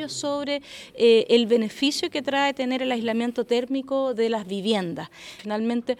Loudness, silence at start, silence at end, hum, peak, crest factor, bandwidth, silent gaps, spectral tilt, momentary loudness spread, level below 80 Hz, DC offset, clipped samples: -24 LUFS; 0 s; 0.05 s; none; -6 dBFS; 18 dB; 13 kHz; none; -4 dB/octave; 12 LU; -68 dBFS; under 0.1%; under 0.1%